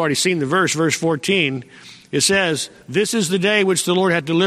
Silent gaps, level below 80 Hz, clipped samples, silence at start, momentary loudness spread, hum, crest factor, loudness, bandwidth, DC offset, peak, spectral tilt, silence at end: none; -58 dBFS; under 0.1%; 0 s; 6 LU; none; 16 dB; -18 LUFS; 15.5 kHz; under 0.1%; -2 dBFS; -3.5 dB/octave; 0 s